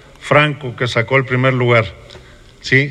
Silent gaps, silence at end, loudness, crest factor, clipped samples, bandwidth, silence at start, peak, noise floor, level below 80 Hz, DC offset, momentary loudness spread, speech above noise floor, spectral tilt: none; 0 s; -15 LUFS; 16 dB; under 0.1%; 10 kHz; 0.2 s; 0 dBFS; -35 dBFS; -46 dBFS; under 0.1%; 8 LU; 20 dB; -6 dB/octave